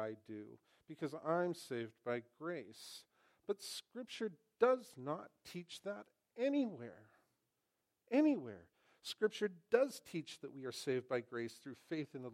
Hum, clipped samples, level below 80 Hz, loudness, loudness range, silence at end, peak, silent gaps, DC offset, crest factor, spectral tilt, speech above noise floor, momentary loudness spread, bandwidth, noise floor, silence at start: none; under 0.1%; under -90 dBFS; -41 LUFS; 5 LU; 0 s; -20 dBFS; none; under 0.1%; 22 dB; -5 dB/octave; 46 dB; 18 LU; 16 kHz; -87 dBFS; 0 s